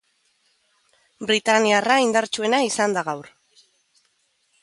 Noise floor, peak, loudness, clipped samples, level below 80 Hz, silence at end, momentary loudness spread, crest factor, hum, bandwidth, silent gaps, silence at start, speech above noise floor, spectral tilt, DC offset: -67 dBFS; -4 dBFS; -20 LUFS; under 0.1%; -72 dBFS; 1.4 s; 12 LU; 20 dB; none; 11.5 kHz; none; 1.2 s; 47 dB; -2.5 dB/octave; under 0.1%